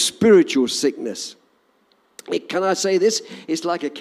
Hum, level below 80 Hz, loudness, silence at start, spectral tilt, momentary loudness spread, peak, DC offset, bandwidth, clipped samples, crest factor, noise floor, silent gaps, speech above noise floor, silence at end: none; -66 dBFS; -19 LUFS; 0 s; -3.5 dB/octave; 14 LU; -4 dBFS; under 0.1%; 15 kHz; under 0.1%; 16 dB; -61 dBFS; none; 42 dB; 0 s